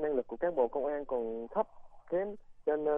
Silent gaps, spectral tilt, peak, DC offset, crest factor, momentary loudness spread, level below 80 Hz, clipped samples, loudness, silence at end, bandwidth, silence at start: none; -9 dB/octave; -16 dBFS; under 0.1%; 16 dB; 6 LU; -60 dBFS; under 0.1%; -35 LUFS; 0 s; 3.6 kHz; 0 s